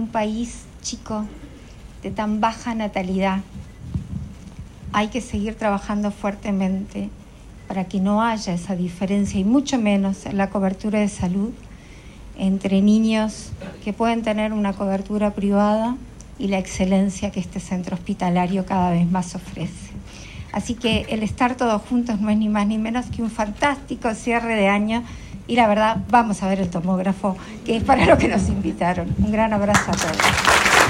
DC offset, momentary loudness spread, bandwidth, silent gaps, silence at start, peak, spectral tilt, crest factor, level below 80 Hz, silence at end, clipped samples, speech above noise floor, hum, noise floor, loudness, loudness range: under 0.1%; 14 LU; 16 kHz; none; 0 s; 0 dBFS; -5 dB/octave; 20 dB; -40 dBFS; 0 s; under 0.1%; 20 dB; none; -41 dBFS; -21 LUFS; 6 LU